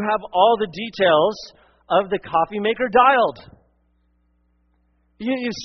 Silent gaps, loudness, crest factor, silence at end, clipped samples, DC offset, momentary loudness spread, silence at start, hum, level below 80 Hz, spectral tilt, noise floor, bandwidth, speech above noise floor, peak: none; -19 LUFS; 18 dB; 0 s; under 0.1%; under 0.1%; 11 LU; 0 s; none; -58 dBFS; -2 dB/octave; -64 dBFS; 6.4 kHz; 44 dB; -2 dBFS